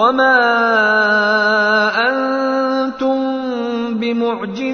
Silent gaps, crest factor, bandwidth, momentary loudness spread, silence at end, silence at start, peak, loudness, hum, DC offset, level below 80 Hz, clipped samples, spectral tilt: none; 14 dB; 6.6 kHz; 8 LU; 0 s; 0 s; -2 dBFS; -15 LUFS; none; under 0.1%; -58 dBFS; under 0.1%; -5 dB/octave